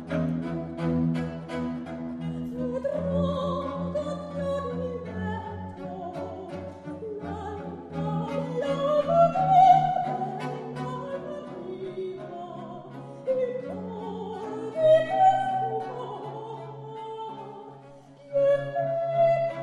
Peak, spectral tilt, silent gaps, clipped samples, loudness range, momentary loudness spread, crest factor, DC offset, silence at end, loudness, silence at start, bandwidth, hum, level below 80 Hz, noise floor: -8 dBFS; -8 dB/octave; none; under 0.1%; 11 LU; 17 LU; 20 dB; under 0.1%; 0 s; -27 LUFS; 0 s; 10.5 kHz; none; -56 dBFS; -49 dBFS